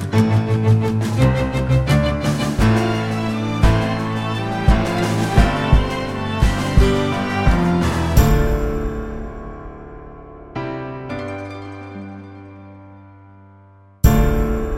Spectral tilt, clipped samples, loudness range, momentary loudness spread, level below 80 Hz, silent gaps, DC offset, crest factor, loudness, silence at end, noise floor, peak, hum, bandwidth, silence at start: -6.5 dB/octave; under 0.1%; 13 LU; 17 LU; -24 dBFS; none; under 0.1%; 16 dB; -18 LUFS; 0 s; -47 dBFS; -2 dBFS; none; 16.5 kHz; 0 s